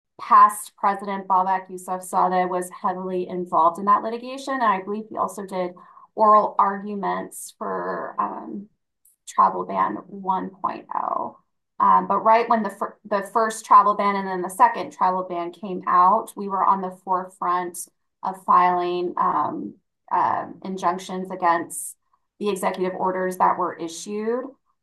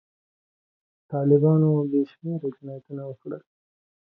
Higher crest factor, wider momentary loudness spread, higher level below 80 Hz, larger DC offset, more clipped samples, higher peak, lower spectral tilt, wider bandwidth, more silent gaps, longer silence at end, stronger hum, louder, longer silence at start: about the same, 18 dB vs 18 dB; second, 14 LU vs 19 LU; about the same, -76 dBFS vs -72 dBFS; neither; neither; first, -4 dBFS vs -8 dBFS; second, -5 dB/octave vs -14 dB/octave; first, 12.5 kHz vs 3.6 kHz; neither; second, 0.3 s vs 0.65 s; neither; about the same, -22 LUFS vs -23 LUFS; second, 0.2 s vs 1.1 s